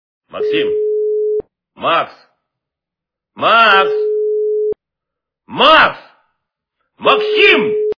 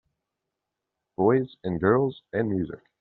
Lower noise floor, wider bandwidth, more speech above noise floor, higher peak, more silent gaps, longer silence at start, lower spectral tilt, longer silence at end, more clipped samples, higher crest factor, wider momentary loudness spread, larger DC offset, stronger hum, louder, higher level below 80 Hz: about the same, -83 dBFS vs -85 dBFS; first, 5.4 kHz vs 4.3 kHz; first, 72 dB vs 60 dB; first, 0 dBFS vs -8 dBFS; neither; second, 0.35 s vs 1.2 s; second, -4.5 dB/octave vs -7.5 dB/octave; second, 0.05 s vs 0.25 s; neither; about the same, 16 dB vs 20 dB; first, 14 LU vs 9 LU; neither; neither; first, -13 LUFS vs -26 LUFS; about the same, -54 dBFS vs -58 dBFS